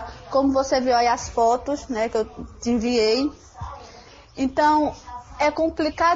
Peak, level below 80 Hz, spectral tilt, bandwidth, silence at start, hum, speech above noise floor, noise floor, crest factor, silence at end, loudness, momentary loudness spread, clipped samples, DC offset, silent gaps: -8 dBFS; -44 dBFS; -4 dB/octave; 8 kHz; 0 s; none; 25 dB; -46 dBFS; 14 dB; 0 s; -22 LUFS; 18 LU; under 0.1%; under 0.1%; none